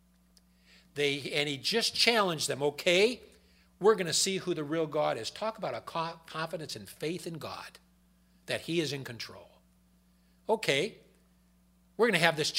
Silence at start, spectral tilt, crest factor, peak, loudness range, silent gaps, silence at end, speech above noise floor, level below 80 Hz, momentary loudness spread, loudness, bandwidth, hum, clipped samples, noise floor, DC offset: 0.95 s; -3 dB/octave; 26 dB; -6 dBFS; 10 LU; none; 0 s; 35 dB; -70 dBFS; 16 LU; -30 LUFS; 16 kHz; none; under 0.1%; -65 dBFS; under 0.1%